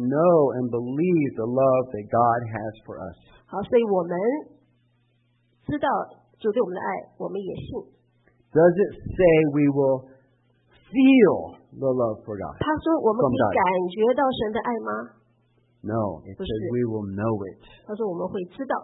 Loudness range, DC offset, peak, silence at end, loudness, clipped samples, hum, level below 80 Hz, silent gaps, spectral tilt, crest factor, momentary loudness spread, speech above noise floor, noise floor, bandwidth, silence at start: 8 LU; under 0.1%; -6 dBFS; 0 s; -23 LUFS; under 0.1%; none; -54 dBFS; none; -11.5 dB/octave; 18 dB; 16 LU; 43 dB; -66 dBFS; 4 kHz; 0 s